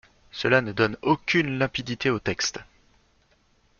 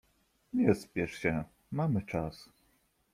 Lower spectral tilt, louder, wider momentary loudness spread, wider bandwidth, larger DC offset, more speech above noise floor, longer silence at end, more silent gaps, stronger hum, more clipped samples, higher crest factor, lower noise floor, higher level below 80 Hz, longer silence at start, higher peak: second, -4.5 dB/octave vs -7.5 dB/octave; first, -24 LUFS vs -33 LUFS; second, 7 LU vs 11 LU; second, 7.2 kHz vs 15 kHz; neither; about the same, 39 dB vs 40 dB; first, 1.15 s vs 0.7 s; neither; neither; neither; about the same, 22 dB vs 22 dB; second, -64 dBFS vs -72 dBFS; about the same, -54 dBFS vs -58 dBFS; second, 0.35 s vs 0.55 s; first, -4 dBFS vs -12 dBFS